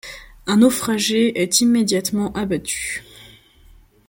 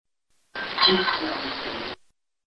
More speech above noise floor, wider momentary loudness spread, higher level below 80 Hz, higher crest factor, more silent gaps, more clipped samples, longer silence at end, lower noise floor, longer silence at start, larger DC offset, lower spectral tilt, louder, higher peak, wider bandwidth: second, 31 dB vs 41 dB; second, 12 LU vs 18 LU; first, -48 dBFS vs -58 dBFS; about the same, 18 dB vs 22 dB; neither; neither; first, 0.85 s vs 0.55 s; second, -49 dBFS vs -67 dBFS; second, 0.05 s vs 0.55 s; neither; second, -3.5 dB/octave vs -5 dB/octave; first, -18 LUFS vs -23 LUFS; first, -2 dBFS vs -6 dBFS; first, 17 kHz vs 9.8 kHz